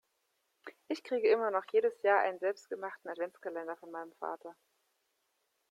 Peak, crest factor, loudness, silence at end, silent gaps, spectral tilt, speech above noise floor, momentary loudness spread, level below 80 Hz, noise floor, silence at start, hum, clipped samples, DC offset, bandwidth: -16 dBFS; 20 dB; -34 LUFS; 1.2 s; none; -4 dB/octave; 46 dB; 17 LU; -88 dBFS; -80 dBFS; 0.65 s; none; under 0.1%; under 0.1%; 10 kHz